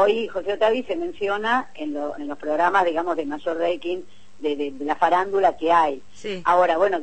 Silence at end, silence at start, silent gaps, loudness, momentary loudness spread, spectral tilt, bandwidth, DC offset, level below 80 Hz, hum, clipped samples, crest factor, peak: 0 s; 0 s; none; -23 LUFS; 11 LU; -5 dB/octave; 8.8 kHz; 1%; -58 dBFS; none; under 0.1%; 16 dB; -6 dBFS